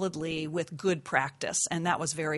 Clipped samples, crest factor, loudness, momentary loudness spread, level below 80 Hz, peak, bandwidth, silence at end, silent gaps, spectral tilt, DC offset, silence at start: under 0.1%; 22 dB; -30 LUFS; 5 LU; -66 dBFS; -10 dBFS; 11.5 kHz; 0 s; none; -3.5 dB/octave; under 0.1%; 0 s